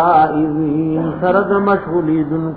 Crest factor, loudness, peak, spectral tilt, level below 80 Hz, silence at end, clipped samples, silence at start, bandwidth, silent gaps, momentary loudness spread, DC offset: 12 dB; -15 LUFS; -2 dBFS; -12 dB/octave; -46 dBFS; 0 s; under 0.1%; 0 s; 4.8 kHz; none; 5 LU; 0.3%